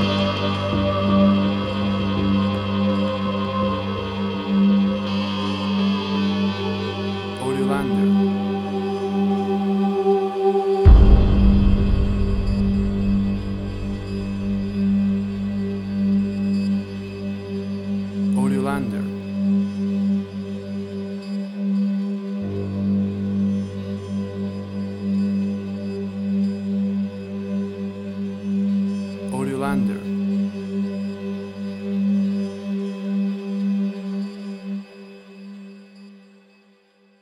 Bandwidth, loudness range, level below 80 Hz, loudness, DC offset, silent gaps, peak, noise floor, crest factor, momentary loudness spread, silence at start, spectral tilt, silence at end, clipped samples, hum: 11.5 kHz; 7 LU; -28 dBFS; -22 LUFS; under 0.1%; none; 0 dBFS; -57 dBFS; 20 dB; 11 LU; 0 s; -8 dB/octave; 1.05 s; under 0.1%; none